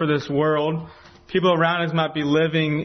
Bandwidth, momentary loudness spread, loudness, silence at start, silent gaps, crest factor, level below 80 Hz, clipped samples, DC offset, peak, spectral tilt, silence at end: 6.4 kHz; 8 LU; -21 LUFS; 0 s; none; 14 dB; -58 dBFS; under 0.1%; under 0.1%; -6 dBFS; -7 dB/octave; 0 s